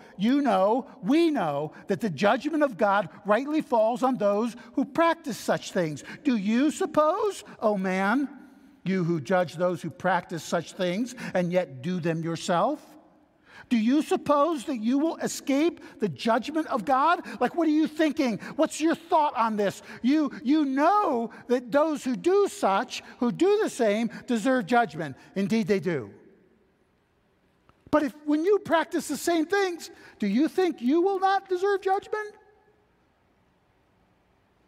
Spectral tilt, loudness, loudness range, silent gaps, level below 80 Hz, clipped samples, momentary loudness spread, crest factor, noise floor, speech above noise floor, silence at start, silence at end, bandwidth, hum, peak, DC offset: -5.5 dB/octave; -26 LUFS; 4 LU; none; -70 dBFS; under 0.1%; 7 LU; 18 dB; -67 dBFS; 42 dB; 0.2 s; 2.35 s; 15.5 kHz; none; -8 dBFS; under 0.1%